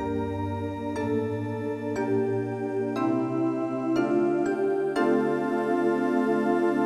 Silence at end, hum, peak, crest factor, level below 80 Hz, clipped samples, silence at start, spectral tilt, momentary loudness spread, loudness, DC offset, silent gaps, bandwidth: 0 s; none; -12 dBFS; 14 dB; -58 dBFS; under 0.1%; 0 s; -8 dB/octave; 6 LU; -27 LUFS; under 0.1%; none; 11 kHz